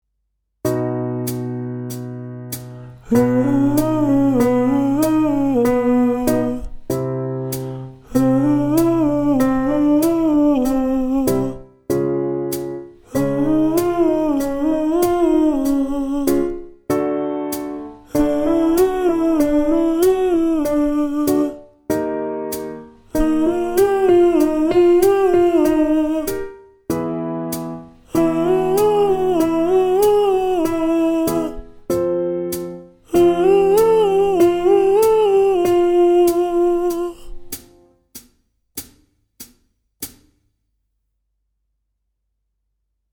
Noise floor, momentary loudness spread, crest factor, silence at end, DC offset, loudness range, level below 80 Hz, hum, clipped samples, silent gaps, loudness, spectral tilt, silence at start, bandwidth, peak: -73 dBFS; 15 LU; 16 dB; 3.05 s; under 0.1%; 5 LU; -40 dBFS; none; under 0.1%; none; -17 LUFS; -6.5 dB/octave; 0.65 s; over 20 kHz; -2 dBFS